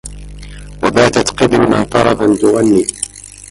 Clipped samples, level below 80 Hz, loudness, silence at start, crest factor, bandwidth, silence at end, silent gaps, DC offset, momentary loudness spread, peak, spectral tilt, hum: under 0.1%; -34 dBFS; -12 LUFS; 0.05 s; 12 dB; 11.5 kHz; 0.05 s; none; under 0.1%; 22 LU; 0 dBFS; -4.5 dB/octave; 50 Hz at -35 dBFS